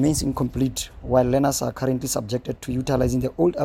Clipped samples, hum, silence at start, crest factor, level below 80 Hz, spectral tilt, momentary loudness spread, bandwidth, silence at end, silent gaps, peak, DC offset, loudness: under 0.1%; none; 0 s; 18 dB; -38 dBFS; -5.5 dB/octave; 8 LU; 17 kHz; 0 s; none; -4 dBFS; under 0.1%; -23 LUFS